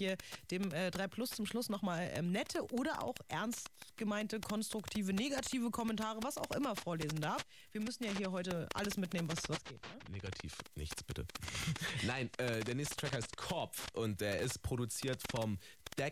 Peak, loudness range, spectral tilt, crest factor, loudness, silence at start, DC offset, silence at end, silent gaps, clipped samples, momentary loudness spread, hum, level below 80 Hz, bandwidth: -24 dBFS; 3 LU; -4.5 dB/octave; 16 dB; -40 LUFS; 0 s; under 0.1%; 0 s; none; under 0.1%; 8 LU; none; -60 dBFS; 16 kHz